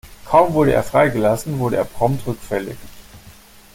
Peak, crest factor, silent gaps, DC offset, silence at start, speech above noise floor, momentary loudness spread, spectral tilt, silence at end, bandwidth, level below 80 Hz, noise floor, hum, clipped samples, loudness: -2 dBFS; 18 dB; none; under 0.1%; 0.05 s; 27 dB; 10 LU; -6.5 dB/octave; 0.45 s; 17 kHz; -42 dBFS; -44 dBFS; none; under 0.1%; -18 LUFS